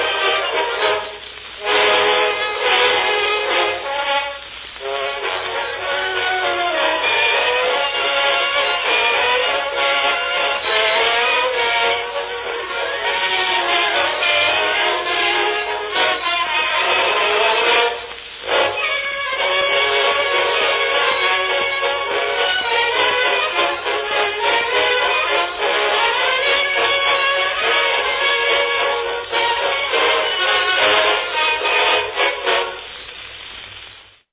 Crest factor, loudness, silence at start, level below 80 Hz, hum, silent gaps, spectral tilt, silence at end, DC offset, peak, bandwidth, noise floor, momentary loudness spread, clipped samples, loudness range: 16 dB; -16 LUFS; 0 s; -52 dBFS; none; none; -5 dB/octave; 0.3 s; under 0.1%; -2 dBFS; 4 kHz; -42 dBFS; 8 LU; under 0.1%; 2 LU